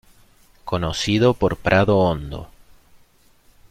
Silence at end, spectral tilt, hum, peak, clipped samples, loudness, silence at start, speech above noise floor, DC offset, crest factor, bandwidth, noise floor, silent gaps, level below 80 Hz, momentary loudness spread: 1.25 s; -6 dB/octave; none; -4 dBFS; under 0.1%; -19 LUFS; 0.65 s; 36 dB; under 0.1%; 18 dB; 15.5 kHz; -55 dBFS; none; -42 dBFS; 18 LU